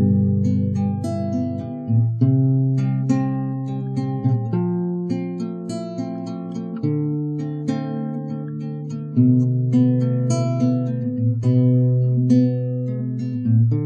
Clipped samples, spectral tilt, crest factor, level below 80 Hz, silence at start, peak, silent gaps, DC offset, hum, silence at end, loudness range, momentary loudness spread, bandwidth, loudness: under 0.1%; -9.5 dB/octave; 14 dB; -64 dBFS; 0 s; -6 dBFS; none; under 0.1%; none; 0 s; 7 LU; 11 LU; 8.6 kHz; -21 LUFS